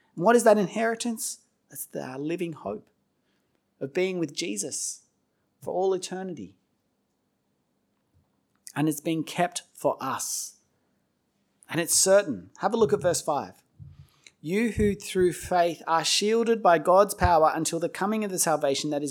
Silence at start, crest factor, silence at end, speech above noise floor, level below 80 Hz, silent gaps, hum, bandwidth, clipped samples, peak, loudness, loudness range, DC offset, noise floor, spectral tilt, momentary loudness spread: 0.15 s; 20 dB; 0 s; 49 dB; -50 dBFS; none; none; 19.5 kHz; under 0.1%; -6 dBFS; -25 LUFS; 12 LU; under 0.1%; -74 dBFS; -3.5 dB/octave; 16 LU